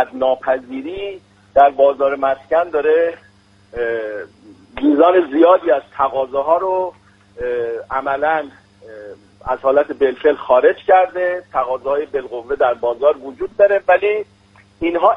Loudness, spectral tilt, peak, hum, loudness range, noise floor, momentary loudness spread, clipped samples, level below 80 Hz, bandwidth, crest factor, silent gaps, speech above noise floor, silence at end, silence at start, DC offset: -16 LUFS; -6.5 dB/octave; 0 dBFS; none; 4 LU; -50 dBFS; 15 LU; under 0.1%; -50 dBFS; 5.4 kHz; 16 dB; none; 34 dB; 0 s; 0 s; under 0.1%